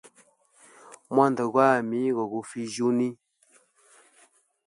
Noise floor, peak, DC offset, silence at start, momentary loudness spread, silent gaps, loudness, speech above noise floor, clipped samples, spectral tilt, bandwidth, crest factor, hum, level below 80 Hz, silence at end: -63 dBFS; -6 dBFS; under 0.1%; 0.9 s; 11 LU; none; -25 LUFS; 39 dB; under 0.1%; -6 dB/octave; 11.5 kHz; 22 dB; none; -78 dBFS; 1.5 s